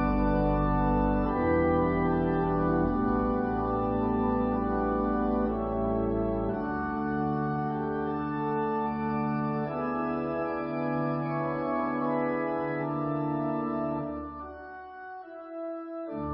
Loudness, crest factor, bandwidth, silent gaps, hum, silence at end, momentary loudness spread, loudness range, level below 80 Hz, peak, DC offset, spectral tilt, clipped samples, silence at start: -29 LUFS; 14 dB; 5.6 kHz; none; none; 0 s; 11 LU; 5 LU; -40 dBFS; -14 dBFS; under 0.1%; -12 dB/octave; under 0.1%; 0 s